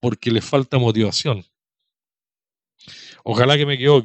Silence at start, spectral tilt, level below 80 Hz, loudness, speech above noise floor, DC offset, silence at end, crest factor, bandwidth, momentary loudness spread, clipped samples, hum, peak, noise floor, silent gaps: 0.05 s; -5.5 dB/octave; -58 dBFS; -18 LUFS; over 73 dB; under 0.1%; 0 s; 20 dB; 8.6 kHz; 12 LU; under 0.1%; none; 0 dBFS; under -90 dBFS; none